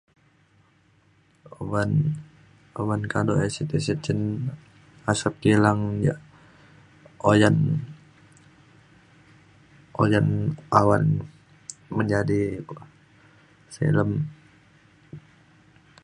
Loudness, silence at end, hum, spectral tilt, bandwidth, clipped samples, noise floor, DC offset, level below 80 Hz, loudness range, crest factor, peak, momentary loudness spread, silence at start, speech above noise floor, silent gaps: -24 LUFS; 0.85 s; none; -6.5 dB/octave; 11 kHz; under 0.1%; -61 dBFS; under 0.1%; -52 dBFS; 5 LU; 24 dB; 0 dBFS; 22 LU; 1.6 s; 38 dB; none